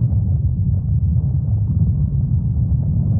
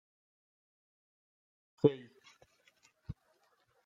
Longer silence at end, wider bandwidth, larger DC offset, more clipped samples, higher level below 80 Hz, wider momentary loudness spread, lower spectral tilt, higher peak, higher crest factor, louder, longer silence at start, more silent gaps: second, 0 s vs 0.75 s; second, 1.3 kHz vs 7.4 kHz; neither; neither; first, -24 dBFS vs -68 dBFS; second, 1 LU vs 21 LU; first, -18.5 dB/octave vs -9 dB/octave; first, -6 dBFS vs -12 dBFS; second, 10 dB vs 30 dB; first, -19 LUFS vs -32 LUFS; second, 0 s vs 1.85 s; neither